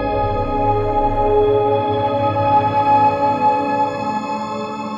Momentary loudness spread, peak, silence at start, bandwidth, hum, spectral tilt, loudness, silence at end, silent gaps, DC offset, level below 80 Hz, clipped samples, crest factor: 8 LU; -4 dBFS; 0 s; 7.4 kHz; none; -7.5 dB/octave; -17 LUFS; 0 s; none; under 0.1%; -32 dBFS; under 0.1%; 12 dB